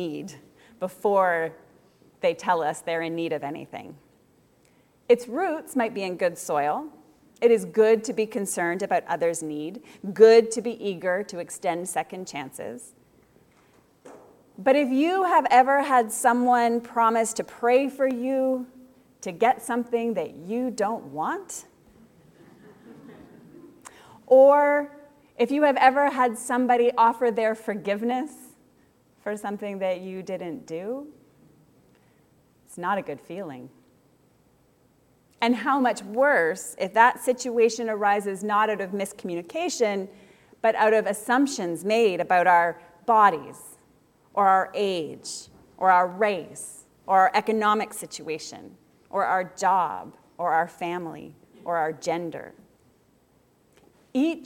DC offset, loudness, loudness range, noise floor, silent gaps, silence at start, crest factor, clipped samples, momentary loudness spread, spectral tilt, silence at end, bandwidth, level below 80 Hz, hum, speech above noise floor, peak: under 0.1%; -24 LUFS; 12 LU; -62 dBFS; none; 0 s; 22 dB; under 0.1%; 17 LU; -4 dB/octave; 0 s; 16.5 kHz; -72 dBFS; none; 39 dB; -4 dBFS